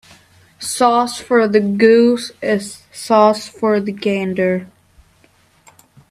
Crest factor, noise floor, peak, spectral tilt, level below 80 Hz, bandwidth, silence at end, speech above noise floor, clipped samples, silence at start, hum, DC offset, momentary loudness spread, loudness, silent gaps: 16 dB; -54 dBFS; 0 dBFS; -5 dB/octave; -58 dBFS; 14.5 kHz; 1.45 s; 39 dB; under 0.1%; 0.6 s; none; under 0.1%; 12 LU; -15 LUFS; none